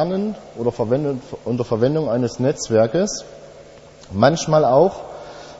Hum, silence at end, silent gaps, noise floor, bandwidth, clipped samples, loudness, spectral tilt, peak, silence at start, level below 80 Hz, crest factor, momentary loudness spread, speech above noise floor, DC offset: none; 0 s; none; -43 dBFS; 8 kHz; under 0.1%; -19 LUFS; -6 dB/octave; 0 dBFS; 0 s; -50 dBFS; 20 dB; 15 LU; 24 dB; under 0.1%